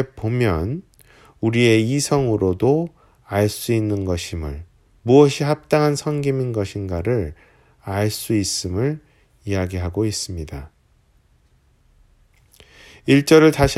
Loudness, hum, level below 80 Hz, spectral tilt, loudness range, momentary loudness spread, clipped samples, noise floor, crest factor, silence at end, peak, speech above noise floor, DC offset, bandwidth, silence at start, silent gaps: -19 LUFS; none; -40 dBFS; -5.5 dB/octave; 9 LU; 18 LU; under 0.1%; -58 dBFS; 20 dB; 0 s; 0 dBFS; 39 dB; under 0.1%; 16 kHz; 0 s; none